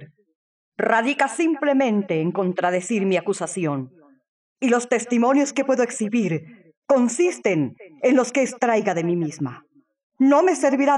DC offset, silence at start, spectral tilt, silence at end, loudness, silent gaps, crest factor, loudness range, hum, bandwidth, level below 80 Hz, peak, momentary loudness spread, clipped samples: under 0.1%; 0 s; -5.5 dB/octave; 0 s; -21 LUFS; 0.35-0.72 s, 4.28-4.56 s, 6.77-6.82 s, 10.03-10.10 s; 18 dB; 2 LU; none; 11.5 kHz; -78 dBFS; -4 dBFS; 8 LU; under 0.1%